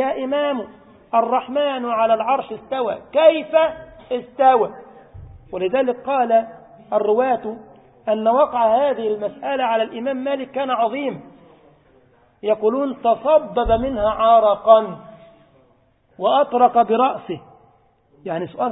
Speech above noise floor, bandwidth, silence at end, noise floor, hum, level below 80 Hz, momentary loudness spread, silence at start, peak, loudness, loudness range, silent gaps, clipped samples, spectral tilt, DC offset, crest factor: 40 dB; 4 kHz; 0 s; -58 dBFS; none; -46 dBFS; 14 LU; 0 s; 0 dBFS; -19 LUFS; 5 LU; none; under 0.1%; -10 dB/octave; under 0.1%; 20 dB